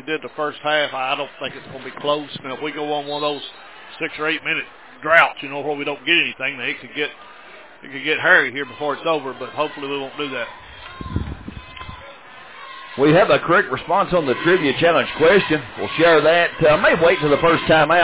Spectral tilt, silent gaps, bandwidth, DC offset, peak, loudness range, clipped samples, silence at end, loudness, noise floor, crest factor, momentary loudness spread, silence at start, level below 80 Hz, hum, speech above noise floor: -8.5 dB/octave; none; 4 kHz; 0.3%; 0 dBFS; 10 LU; under 0.1%; 0 s; -18 LUFS; -42 dBFS; 20 dB; 20 LU; 0.05 s; -46 dBFS; none; 24 dB